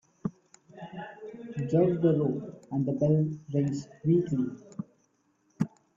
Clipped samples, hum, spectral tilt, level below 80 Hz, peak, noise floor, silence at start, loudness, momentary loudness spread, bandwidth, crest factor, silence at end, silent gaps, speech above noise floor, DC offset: under 0.1%; none; -9.5 dB/octave; -66 dBFS; -14 dBFS; -71 dBFS; 0.25 s; -29 LUFS; 17 LU; 7.6 kHz; 16 dB; 0.3 s; none; 44 dB; under 0.1%